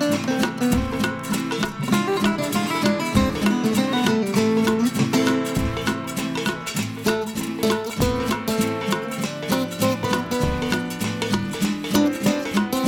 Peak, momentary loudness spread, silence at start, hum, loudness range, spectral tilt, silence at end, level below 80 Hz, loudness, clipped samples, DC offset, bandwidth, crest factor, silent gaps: -4 dBFS; 5 LU; 0 s; none; 3 LU; -5 dB/octave; 0 s; -40 dBFS; -22 LUFS; under 0.1%; under 0.1%; over 20 kHz; 18 dB; none